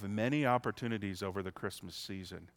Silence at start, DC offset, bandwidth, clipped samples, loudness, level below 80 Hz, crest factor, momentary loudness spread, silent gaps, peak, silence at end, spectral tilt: 0 s; under 0.1%; 17.5 kHz; under 0.1%; -37 LUFS; -68 dBFS; 22 dB; 12 LU; none; -16 dBFS; 0.1 s; -6 dB/octave